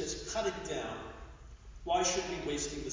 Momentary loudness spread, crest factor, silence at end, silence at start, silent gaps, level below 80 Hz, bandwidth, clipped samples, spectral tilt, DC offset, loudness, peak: 21 LU; 18 dB; 0 s; 0 s; none; -52 dBFS; 7.8 kHz; under 0.1%; -3 dB/octave; under 0.1%; -35 LUFS; -18 dBFS